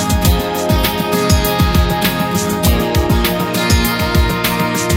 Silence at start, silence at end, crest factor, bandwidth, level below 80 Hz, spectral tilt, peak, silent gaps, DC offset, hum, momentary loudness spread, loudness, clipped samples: 0 s; 0 s; 14 dB; 16.5 kHz; -20 dBFS; -4.5 dB/octave; 0 dBFS; none; under 0.1%; none; 2 LU; -14 LUFS; under 0.1%